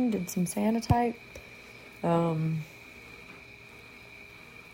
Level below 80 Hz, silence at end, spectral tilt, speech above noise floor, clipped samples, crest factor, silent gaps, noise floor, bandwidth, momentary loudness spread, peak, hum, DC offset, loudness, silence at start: -52 dBFS; 0 s; -6.5 dB/octave; 22 dB; under 0.1%; 22 dB; none; -50 dBFS; 16.5 kHz; 20 LU; -8 dBFS; none; under 0.1%; -29 LUFS; 0 s